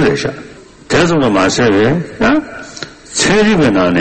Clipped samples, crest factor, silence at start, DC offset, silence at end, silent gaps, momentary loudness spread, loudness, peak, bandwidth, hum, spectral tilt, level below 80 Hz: under 0.1%; 12 dB; 0 s; under 0.1%; 0 s; none; 17 LU; -12 LUFS; 0 dBFS; 8.8 kHz; none; -4.5 dB/octave; -38 dBFS